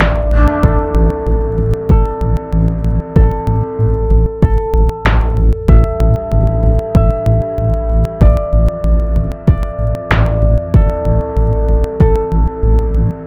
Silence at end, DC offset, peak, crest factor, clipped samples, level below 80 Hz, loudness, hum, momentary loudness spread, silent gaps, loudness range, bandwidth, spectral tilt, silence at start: 0 s; under 0.1%; 0 dBFS; 12 dB; 0.5%; -14 dBFS; -14 LUFS; none; 4 LU; none; 1 LU; 4.5 kHz; -9 dB/octave; 0 s